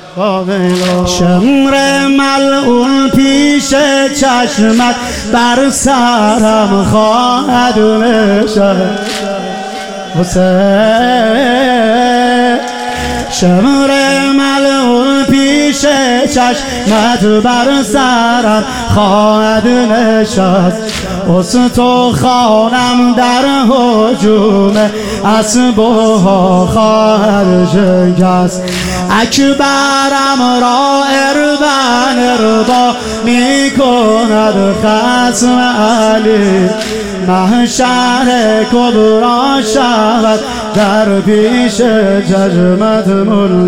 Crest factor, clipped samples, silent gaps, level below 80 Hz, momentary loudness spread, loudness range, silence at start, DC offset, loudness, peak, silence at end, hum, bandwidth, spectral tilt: 8 dB; under 0.1%; none; -36 dBFS; 5 LU; 1 LU; 0 s; 2%; -9 LUFS; 0 dBFS; 0 s; none; 16.5 kHz; -4.5 dB/octave